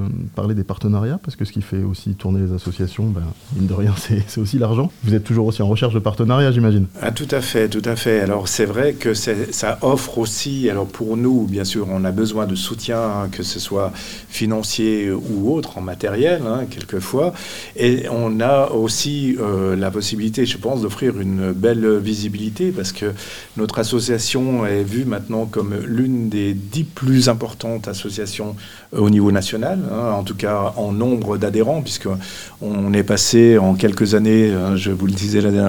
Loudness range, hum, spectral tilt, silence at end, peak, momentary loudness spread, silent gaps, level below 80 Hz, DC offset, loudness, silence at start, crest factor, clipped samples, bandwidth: 5 LU; none; -5.5 dB/octave; 0 s; 0 dBFS; 10 LU; none; -48 dBFS; 0.5%; -19 LUFS; 0 s; 18 dB; under 0.1%; 18 kHz